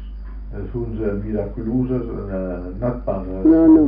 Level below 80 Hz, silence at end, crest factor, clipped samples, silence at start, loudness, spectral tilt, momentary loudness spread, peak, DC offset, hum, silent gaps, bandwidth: -32 dBFS; 0 s; 16 dB; under 0.1%; 0 s; -21 LUFS; -11 dB/octave; 16 LU; -4 dBFS; under 0.1%; none; none; 2.8 kHz